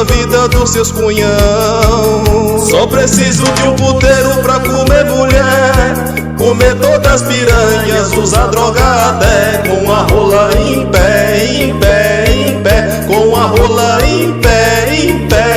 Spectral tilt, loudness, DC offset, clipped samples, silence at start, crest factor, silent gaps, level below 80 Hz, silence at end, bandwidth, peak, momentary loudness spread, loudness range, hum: -4.5 dB/octave; -9 LUFS; under 0.1%; 0.5%; 0 s; 8 dB; none; -18 dBFS; 0 s; 16.5 kHz; 0 dBFS; 3 LU; 1 LU; none